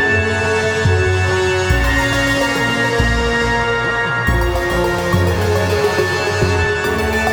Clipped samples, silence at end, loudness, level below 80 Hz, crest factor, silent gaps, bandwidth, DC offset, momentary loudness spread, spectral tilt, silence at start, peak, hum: under 0.1%; 0 s; -15 LUFS; -26 dBFS; 14 dB; none; over 20 kHz; under 0.1%; 2 LU; -5 dB/octave; 0 s; -2 dBFS; none